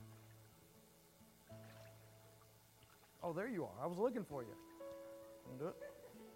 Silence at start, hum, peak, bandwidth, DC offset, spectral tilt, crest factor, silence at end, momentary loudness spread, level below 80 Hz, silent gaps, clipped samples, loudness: 0 s; none; -26 dBFS; 16 kHz; under 0.1%; -6.5 dB/octave; 24 dB; 0 s; 24 LU; -78 dBFS; none; under 0.1%; -47 LUFS